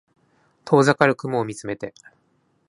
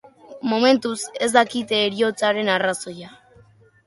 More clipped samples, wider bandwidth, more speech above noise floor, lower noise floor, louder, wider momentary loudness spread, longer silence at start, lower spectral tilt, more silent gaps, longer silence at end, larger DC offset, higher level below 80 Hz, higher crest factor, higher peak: neither; about the same, 11.5 kHz vs 11.5 kHz; first, 45 dB vs 32 dB; first, -66 dBFS vs -53 dBFS; about the same, -20 LUFS vs -20 LUFS; first, 15 LU vs 12 LU; first, 0.65 s vs 0.3 s; first, -6 dB/octave vs -3 dB/octave; neither; about the same, 0.8 s vs 0.75 s; neither; about the same, -64 dBFS vs -66 dBFS; about the same, 22 dB vs 20 dB; about the same, 0 dBFS vs -2 dBFS